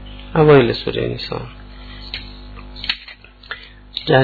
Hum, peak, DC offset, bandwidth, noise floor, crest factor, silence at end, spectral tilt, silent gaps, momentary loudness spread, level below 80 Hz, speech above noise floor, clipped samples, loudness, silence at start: 50 Hz at -40 dBFS; -2 dBFS; under 0.1%; 4.8 kHz; -40 dBFS; 16 dB; 0 s; -8.5 dB/octave; none; 25 LU; -38 dBFS; 25 dB; under 0.1%; -17 LUFS; 0 s